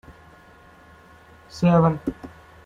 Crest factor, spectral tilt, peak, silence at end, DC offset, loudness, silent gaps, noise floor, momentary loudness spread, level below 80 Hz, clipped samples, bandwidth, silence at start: 18 dB; -8.5 dB/octave; -6 dBFS; 0.4 s; under 0.1%; -21 LUFS; none; -50 dBFS; 24 LU; -50 dBFS; under 0.1%; 7.4 kHz; 0.1 s